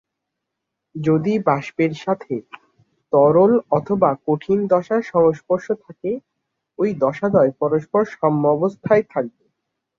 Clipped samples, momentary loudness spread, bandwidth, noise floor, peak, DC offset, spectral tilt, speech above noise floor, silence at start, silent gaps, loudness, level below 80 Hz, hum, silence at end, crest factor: under 0.1%; 11 LU; 7.2 kHz; -80 dBFS; -2 dBFS; under 0.1%; -8.5 dB/octave; 62 dB; 0.95 s; none; -19 LUFS; -60 dBFS; none; 0.7 s; 18 dB